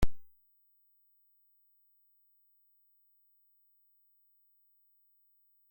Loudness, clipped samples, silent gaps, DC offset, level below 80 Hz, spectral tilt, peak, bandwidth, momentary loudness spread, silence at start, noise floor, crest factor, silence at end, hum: -58 LUFS; under 0.1%; none; under 0.1%; -48 dBFS; -6 dB/octave; -14 dBFS; 16.5 kHz; 0 LU; 0 s; -70 dBFS; 24 dB; 5.5 s; 50 Hz at -115 dBFS